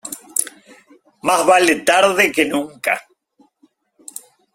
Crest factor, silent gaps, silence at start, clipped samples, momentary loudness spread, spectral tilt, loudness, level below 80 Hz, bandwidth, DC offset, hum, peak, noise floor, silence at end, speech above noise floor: 20 dB; none; 0.05 s; under 0.1%; 22 LU; -2 dB/octave; -16 LUFS; -62 dBFS; 16.5 kHz; under 0.1%; none; 0 dBFS; -59 dBFS; 1.55 s; 44 dB